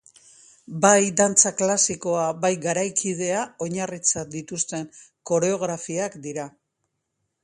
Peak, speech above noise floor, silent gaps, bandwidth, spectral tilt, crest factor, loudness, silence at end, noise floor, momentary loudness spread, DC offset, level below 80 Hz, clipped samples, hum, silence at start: 0 dBFS; 54 dB; none; 11.5 kHz; -3 dB/octave; 24 dB; -22 LUFS; 0.95 s; -77 dBFS; 16 LU; under 0.1%; -66 dBFS; under 0.1%; none; 0.7 s